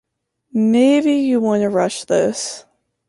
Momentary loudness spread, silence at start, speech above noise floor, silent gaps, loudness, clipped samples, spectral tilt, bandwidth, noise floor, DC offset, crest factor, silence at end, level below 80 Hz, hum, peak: 12 LU; 0.55 s; 48 dB; none; -17 LUFS; under 0.1%; -5 dB/octave; 11.5 kHz; -64 dBFS; under 0.1%; 14 dB; 0.5 s; -62 dBFS; none; -4 dBFS